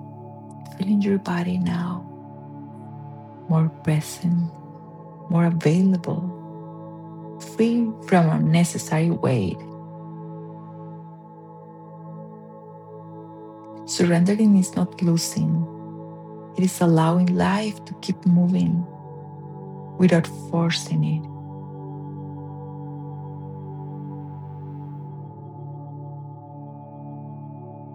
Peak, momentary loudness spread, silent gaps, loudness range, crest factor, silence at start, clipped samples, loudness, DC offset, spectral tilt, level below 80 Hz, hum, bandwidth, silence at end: -4 dBFS; 21 LU; none; 15 LU; 20 dB; 0 s; under 0.1%; -22 LUFS; under 0.1%; -6.5 dB/octave; -64 dBFS; none; 14.5 kHz; 0 s